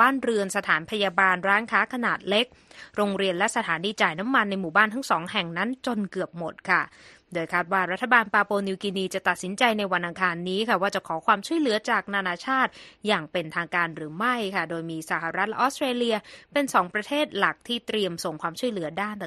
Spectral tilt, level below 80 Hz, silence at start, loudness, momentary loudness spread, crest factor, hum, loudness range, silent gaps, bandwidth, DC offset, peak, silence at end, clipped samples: -4 dB/octave; -66 dBFS; 0 s; -25 LUFS; 8 LU; 22 dB; none; 3 LU; none; 13 kHz; under 0.1%; -4 dBFS; 0 s; under 0.1%